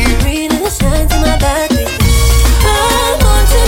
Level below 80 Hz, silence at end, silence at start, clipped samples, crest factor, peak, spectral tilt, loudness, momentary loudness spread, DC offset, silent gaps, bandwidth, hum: -12 dBFS; 0 s; 0 s; under 0.1%; 10 dB; 0 dBFS; -4.5 dB/octave; -11 LUFS; 4 LU; under 0.1%; none; 17 kHz; none